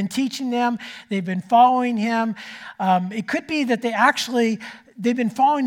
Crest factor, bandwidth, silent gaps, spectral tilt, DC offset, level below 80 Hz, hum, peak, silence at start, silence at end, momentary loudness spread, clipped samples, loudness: 18 dB; 17 kHz; none; -5 dB/octave; under 0.1%; -70 dBFS; none; -2 dBFS; 0 s; 0 s; 11 LU; under 0.1%; -21 LUFS